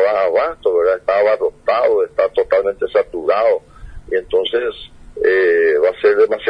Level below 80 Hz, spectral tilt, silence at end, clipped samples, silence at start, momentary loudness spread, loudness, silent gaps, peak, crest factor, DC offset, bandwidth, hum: -44 dBFS; -5.5 dB/octave; 0 s; under 0.1%; 0 s; 8 LU; -16 LUFS; none; -2 dBFS; 14 dB; under 0.1%; 5.4 kHz; none